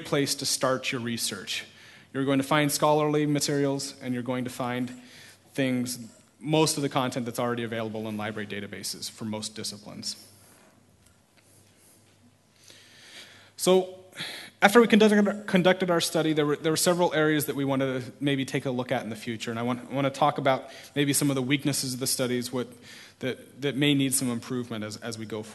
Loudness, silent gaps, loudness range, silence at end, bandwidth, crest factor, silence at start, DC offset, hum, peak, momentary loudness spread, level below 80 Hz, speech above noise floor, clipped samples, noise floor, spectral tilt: -27 LUFS; none; 12 LU; 0 s; 12.5 kHz; 24 dB; 0 s; under 0.1%; none; -2 dBFS; 13 LU; -68 dBFS; 34 dB; under 0.1%; -60 dBFS; -4 dB/octave